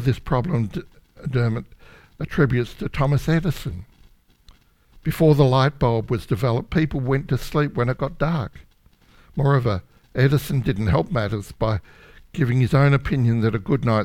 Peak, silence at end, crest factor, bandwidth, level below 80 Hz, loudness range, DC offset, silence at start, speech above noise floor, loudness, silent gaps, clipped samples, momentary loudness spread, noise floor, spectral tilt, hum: -4 dBFS; 0 s; 18 dB; 15.5 kHz; -38 dBFS; 4 LU; under 0.1%; 0 s; 35 dB; -22 LUFS; none; under 0.1%; 13 LU; -55 dBFS; -8 dB/octave; none